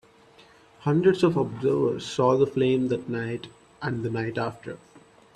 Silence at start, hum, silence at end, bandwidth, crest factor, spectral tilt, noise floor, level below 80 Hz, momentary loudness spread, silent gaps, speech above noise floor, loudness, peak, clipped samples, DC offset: 0.8 s; none; 0.35 s; 10.5 kHz; 18 dB; -7 dB/octave; -54 dBFS; -62 dBFS; 14 LU; none; 30 dB; -25 LUFS; -8 dBFS; under 0.1%; under 0.1%